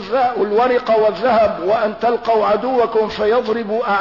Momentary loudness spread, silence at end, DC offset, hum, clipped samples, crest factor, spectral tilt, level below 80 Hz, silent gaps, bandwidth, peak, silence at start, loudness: 3 LU; 0 s; 0.2%; none; under 0.1%; 10 dB; -6.5 dB/octave; -50 dBFS; none; 6 kHz; -6 dBFS; 0 s; -16 LUFS